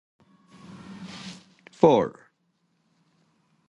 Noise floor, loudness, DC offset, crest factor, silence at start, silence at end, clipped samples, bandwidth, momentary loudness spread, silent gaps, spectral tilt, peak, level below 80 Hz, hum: -71 dBFS; -22 LUFS; under 0.1%; 26 dB; 0.9 s; 1.6 s; under 0.1%; 10.5 kHz; 27 LU; none; -7 dB/octave; -4 dBFS; -66 dBFS; none